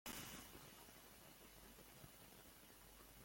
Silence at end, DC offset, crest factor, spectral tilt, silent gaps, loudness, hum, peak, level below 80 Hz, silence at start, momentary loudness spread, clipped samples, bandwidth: 0 s; under 0.1%; 24 dB; -2.5 dB/octave; none; -59 LUFS; none; -38 dBFS; -72 dBFS; 0.05 s; 9 LU; under 0.1%; 17 kHz